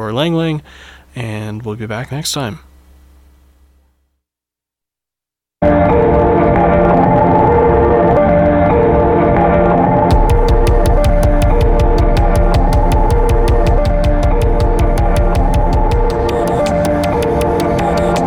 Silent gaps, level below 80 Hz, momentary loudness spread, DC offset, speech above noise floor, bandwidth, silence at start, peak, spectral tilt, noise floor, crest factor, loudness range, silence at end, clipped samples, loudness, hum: none; -16 dBFS; 9 LU; under 0.1%; 67 dB; 14 kHz; 0 s; -2 dBFS; -7 dB/octave; -86 dBFS; 10 dB; 14 LU; 0 s; under 0.1%; -13 LUFS; none